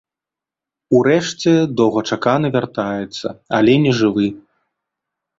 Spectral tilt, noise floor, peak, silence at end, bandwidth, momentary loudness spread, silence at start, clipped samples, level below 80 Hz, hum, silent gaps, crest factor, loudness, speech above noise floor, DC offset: -6 dB/octave; -87 dBFS; -2 dBFS; 1 s; 7.8 kHz; 9 LU; 0.9 s; under 0.1%; -56 dBFS; none; none; 16 dB; -16 LUFS; 71 dB; under 0.1%